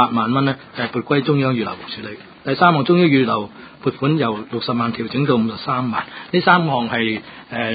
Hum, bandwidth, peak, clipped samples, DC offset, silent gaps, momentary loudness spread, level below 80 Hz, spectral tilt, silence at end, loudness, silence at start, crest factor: none; 5 kHz; 0 dBFS; under 0.1%; under 0.1%; none; 13 LU; -56 dBFS; -11 dB/octave; 0 s; -18 LUFS; 0 s; 18 dB